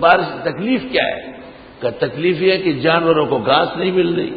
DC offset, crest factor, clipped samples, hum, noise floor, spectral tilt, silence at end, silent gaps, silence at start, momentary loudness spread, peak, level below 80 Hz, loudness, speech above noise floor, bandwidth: under 0.1%; 16 dB; under 0.1%; none; -37 dBFS; -9 dB/octave; 0 s; none; 0 s; 10 LU; 0 dBFS; -50 dBFS; -17 LUFS; 21 dB; 5 kHz